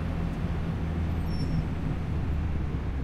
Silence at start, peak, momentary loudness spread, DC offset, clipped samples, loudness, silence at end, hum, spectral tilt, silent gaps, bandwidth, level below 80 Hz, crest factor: 0 s; -16 dBFS; 2 LU; under 0.1%; under 0.1%; -31 LUFS; 0 s; none; -8.5 dB/octave; none; 11.5 kHz; -34 dBFS; 12 dB